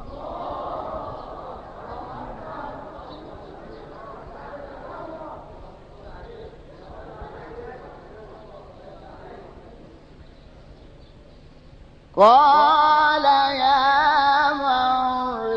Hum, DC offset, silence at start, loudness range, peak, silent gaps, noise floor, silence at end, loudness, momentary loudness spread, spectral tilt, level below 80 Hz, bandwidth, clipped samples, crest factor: none; under 0.1%; 0 s; 24 LU; -4 dBFS; none; -46 dBFS; 0 s; -18 LUFS; 27 LU; -5 dB/octave; -48 dBFS; 7.4 kHz; under 0.1%; 20 dB